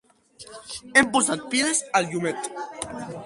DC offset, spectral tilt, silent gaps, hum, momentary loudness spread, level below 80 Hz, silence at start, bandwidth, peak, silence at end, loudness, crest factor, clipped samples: under 0.1%; -2.5 dB/octave; none; none; 18 LU; -60 dBFS; 0.4 s; 11.5 kHz; -4 dBFS; 0 s; -23 LUFS; 22 dB; under 0.1%